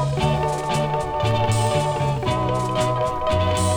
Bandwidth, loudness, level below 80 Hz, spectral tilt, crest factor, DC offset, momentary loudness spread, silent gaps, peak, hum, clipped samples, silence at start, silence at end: over 20 kHz; -22 LUFS; -36 dBFS; -5.5 dB/octave; 12 dB; under 0.1%; 3 LU; none; -8 dBFS; none; under 0.1%; 0 s; 0 s